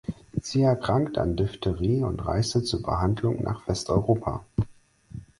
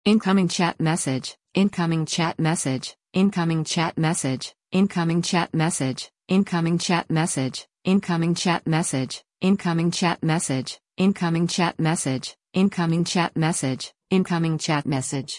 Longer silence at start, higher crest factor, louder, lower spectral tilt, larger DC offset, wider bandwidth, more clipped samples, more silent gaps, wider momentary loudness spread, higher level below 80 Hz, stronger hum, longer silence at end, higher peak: about the same, 0.1 s vs 0.05 s; about the same, 18 dB vs 16 dB; second, -26 LUFS vs -23 LUFS; first, -6.5 dB/octave vs -5 dB/octave; neither; about the same, 11.5 kHz vs 11 kHz; neither; neither; about the same, 8 LU vs 7 LU; first, -40 dBFS vs -62 dBFS; neither; first, 0.15 s vs 0 s; about the same, -8 dBFS vs -8 dBFS